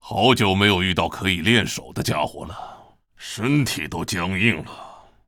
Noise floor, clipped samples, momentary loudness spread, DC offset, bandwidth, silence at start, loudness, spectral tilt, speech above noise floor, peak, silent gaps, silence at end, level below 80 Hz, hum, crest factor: -48 dBFS; under 0.1%; 20 LU; under 0.1%; 19 kHz; 0.05 s; -20 LUFS; -4.5 dB/octave; 27 dB; -2 dBFS; none; 0.3 s; -48 dBFS; none; 20 dB